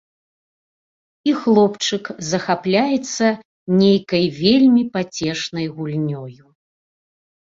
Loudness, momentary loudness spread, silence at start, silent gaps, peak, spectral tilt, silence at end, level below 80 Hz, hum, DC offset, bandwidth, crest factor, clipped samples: -18 LUFS; 11 LU; 1.25 s; 3.45-3.66 s; -2 dBFS; -5.5 dB/octave; 1.15 s; -58 dBFS; none; under 0.1%; 7.8 kHz; 16 dB; under 0.1%